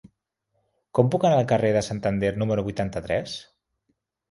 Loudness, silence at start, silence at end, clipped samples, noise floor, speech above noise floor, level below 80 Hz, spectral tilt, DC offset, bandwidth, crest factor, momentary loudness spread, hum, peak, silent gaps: -24 LUFS; 0.95 s; 0.9 s; under 0.1%; -75 dBFS; 52 dB; -50 dBFS; -6.5 dB/octave; under 0.1%; 11.5 kHz; 22 dB; 8 LU; none; -4 dBFS; none